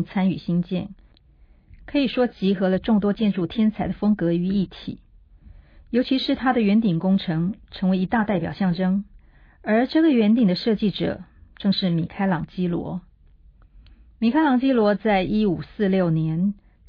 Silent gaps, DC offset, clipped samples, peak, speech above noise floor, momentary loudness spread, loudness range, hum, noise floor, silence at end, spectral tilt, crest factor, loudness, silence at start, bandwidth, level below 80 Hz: none; under 0.1%; under 0.1%; -8 dBFS; 32 dB; 9 LU; 3 LU; none; -53 dBFS; 0.35 s; -9.5 dB/octave; 14 dB; -22 LUFS; 0 s; 5.2 kHz; -48 dBFS